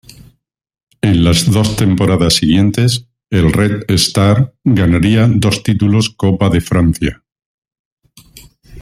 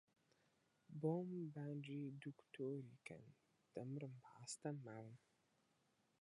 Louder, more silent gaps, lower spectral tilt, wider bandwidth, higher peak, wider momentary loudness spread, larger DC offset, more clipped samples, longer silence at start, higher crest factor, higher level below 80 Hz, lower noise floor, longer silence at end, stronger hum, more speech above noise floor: first, -12 LUFS vs -51 LUFS; first, 7.46-7.62 s, 7.79-7.97 s vs none; about the same, -5.5 dB/octave vs -6.5 dB/octave; first, 15.5 kHz vs 11 kHz; first, 0 dBFS vs -30 dBFS; second, 4 LU vs 14 LU; neither; neither; first, 1.05 s vs 0.9 s; second, 12 dB vs 22 dB; first, -34 dBFS vs under -90 dBFS; second, -59 dBFS vs -83 dBFS; second, 0 s vs 1.05 s; neither; first, 48 dB vs 33 dB